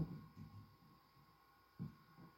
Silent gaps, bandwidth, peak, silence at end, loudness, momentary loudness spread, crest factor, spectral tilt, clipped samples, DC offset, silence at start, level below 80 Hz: none; 16.5 kHz; -32 dBFS; 0 s; -56 LUFS; 15 LU; 22 dB; -8.5 dB/octave; under 0.1%; under 0.1%; 0 s; -72 dBFS